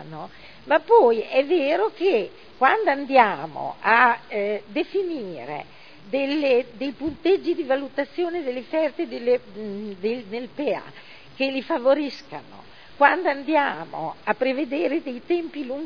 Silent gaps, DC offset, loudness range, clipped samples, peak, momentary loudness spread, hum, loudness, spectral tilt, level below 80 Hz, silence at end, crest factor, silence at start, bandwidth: none; 0.4%; 7 LU; under 0.1%; -2 dBFS; 15 LU; none; -23 LUFS; -6.5 dB/octave; -64 dBFS; 0 s; 22 dB; 0 s; 5.4 kHz